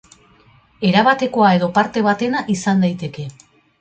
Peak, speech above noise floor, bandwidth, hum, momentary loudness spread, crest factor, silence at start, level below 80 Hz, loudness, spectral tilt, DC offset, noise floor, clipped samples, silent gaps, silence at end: -2 dBFS; 35 dB; 8.8 kHz; none; 13 LU; 16 dB; 0.8 s; -56 dBFS; -16 LUFS; -6 dB/octave; under 0.1%; -51 dBFS; under 0.1%; none; 0.5 s